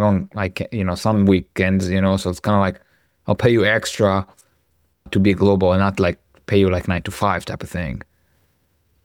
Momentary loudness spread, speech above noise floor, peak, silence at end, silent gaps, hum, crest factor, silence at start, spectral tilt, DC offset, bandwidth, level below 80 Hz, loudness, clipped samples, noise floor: 11 LU; 47 dB; -2 dBFS; 1.05 s; none; none; 16 dB; 0 s; -6.5 dB/octave; under 0.1%; 15.5 kHz; -44 dBFS; -19 LUFS; under 0.1%; -64 dBFS